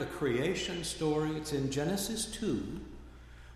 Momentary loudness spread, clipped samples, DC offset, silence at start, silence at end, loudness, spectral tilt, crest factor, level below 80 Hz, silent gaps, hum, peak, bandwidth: 18 LU; under 0.1%; under 0.1%; 0 s; 0 s; -34 LUFS; -4.5 dB/octave; 16 dB; -52 dBFS; none; none; -20 dBFS; 15.5 kHz